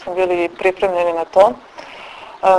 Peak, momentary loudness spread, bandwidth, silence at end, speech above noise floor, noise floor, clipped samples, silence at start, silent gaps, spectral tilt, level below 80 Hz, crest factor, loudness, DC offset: 0 dBFS; 20 LU; 11 kHz; 0 s; 19 dB; -35 dBFS; under 0.1%; 0 s; none; -5 dB/octave; -52 dBFS; 16 dB; -16 LUFS; under 0.1%